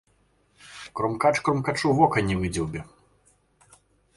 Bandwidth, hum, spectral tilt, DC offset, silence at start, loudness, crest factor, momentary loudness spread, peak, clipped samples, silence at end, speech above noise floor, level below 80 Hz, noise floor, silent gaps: 11.5 kHz; none; -6 dB/octave; under 0.1%; 0.65 s; -24 LUFS; 22 dB; 17 LU; -6 dBFS; under 0.1%; 1.35 s; 41 dB; -48 dBFS; -65 dBFS; none